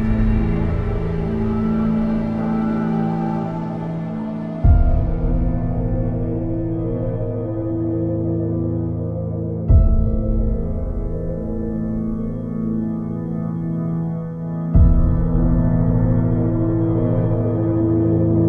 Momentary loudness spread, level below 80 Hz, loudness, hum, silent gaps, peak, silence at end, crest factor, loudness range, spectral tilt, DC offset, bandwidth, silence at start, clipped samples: 8 LU; -24 dBFS; -21 LUFS; none; none; -2 dBFS; 0 s; 16 dB; 6 LU; -11.5 dB/octave; under 0.1%; 4.4 kHz; 0 s; under 0.1%